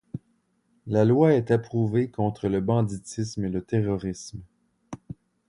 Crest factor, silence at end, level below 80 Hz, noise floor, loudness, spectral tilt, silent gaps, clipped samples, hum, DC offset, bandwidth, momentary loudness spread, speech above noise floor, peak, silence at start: 18 dB; 0.35 s; -52 dBFS; -69 dBFS; -25 LUFS; -7.5 dB/octave; none; under 0.1%; none; under 0.1%; 11 kHz; 22 LU; 45 dB; -6 dBFS; 0.15 s